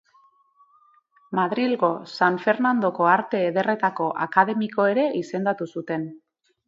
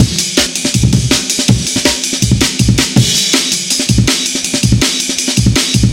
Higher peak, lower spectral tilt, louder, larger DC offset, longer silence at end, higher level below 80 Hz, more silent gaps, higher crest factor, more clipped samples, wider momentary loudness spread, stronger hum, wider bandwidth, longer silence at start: about the same, -2 dBFS vs 0 dBFS; first, -7 dB/octave vs -3.5 dB/octave; second, -23 LUFS vs -11 LUFS; neither; first, 0.5 s vs 0 s; second, -74 dBFS vs -26 dBFS; neither; first, 22 dB vs 12 dB; second, under 0.1% vs 0.4%; first, 9 LU vs 3 LU; neither; second, 7.6 kHz vs 17 kHz; first, 1.3 s vs 0 s